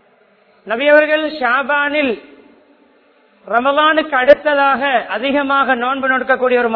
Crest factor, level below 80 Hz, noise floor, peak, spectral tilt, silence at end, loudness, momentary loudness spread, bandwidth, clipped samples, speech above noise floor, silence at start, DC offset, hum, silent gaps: 16 dB; -56 dBFS; -52 dBFS; 0 dBFS; -6 dB/octave; 0 s; -14 LUFS; 6 LU; 5.4 kHz; 0.2%; 38 dB; 0.65 s; under 0.1%; none; none